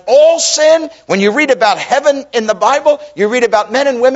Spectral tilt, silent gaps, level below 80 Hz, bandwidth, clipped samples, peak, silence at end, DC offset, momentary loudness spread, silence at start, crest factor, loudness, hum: -2.5 dB/octave; none; -58 dBFS; 8 kHz; under 0.1%; 0 dBFS; 0 s; under 0.1%; 6 LU; 0.05 s; 10 dB; -11 LUFS; none